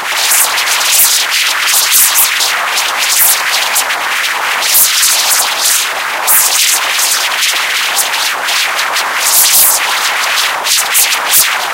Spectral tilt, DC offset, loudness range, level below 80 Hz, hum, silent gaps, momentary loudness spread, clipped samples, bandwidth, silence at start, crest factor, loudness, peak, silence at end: 3.5 dB/octave; under 0.1%; 2 LU; -56 dBFS; none; none; 6 LU; 0.6%; over 20 kHz; 0 s; 10 dB; -8 LUFS; 0 dBFS; 0 s